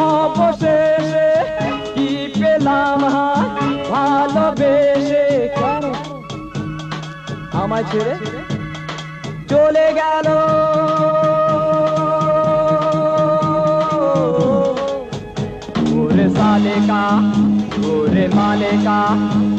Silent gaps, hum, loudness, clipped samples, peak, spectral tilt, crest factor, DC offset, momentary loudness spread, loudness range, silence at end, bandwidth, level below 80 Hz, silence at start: none; none; -16 LUFS; under 0.1%; -4 dBFS; -7 dB/octave; 12 dB; under 0.1%; 11 LU; 5 LU; 0 s; 8.6 kHz; -44 dBFS; 0 s